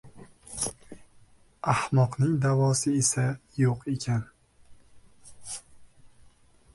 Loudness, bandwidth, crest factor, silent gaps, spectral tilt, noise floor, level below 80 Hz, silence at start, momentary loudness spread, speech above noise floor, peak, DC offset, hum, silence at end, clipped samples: -27 LUFS; 11.5 kHz; 18 dB; none; -5 dB/octave; -57 dBFS; -58 dBFS; 0.05 s; 15 LU; 32 dB; -10 dBFS; under 0.1%; none; 0.65 s; under 0.1%